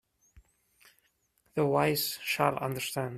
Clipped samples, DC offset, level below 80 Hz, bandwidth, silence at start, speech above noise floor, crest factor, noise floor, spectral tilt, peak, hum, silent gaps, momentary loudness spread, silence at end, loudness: under 0.1%; under 0.1%; -66 dBFS; 16 kHz; 0.35 s; 43 dB; 24 dB; -72 dBFS; -4.5 dB/octave; -10 dBFS; none; none; 7 LU; 0 s; -30 LUFS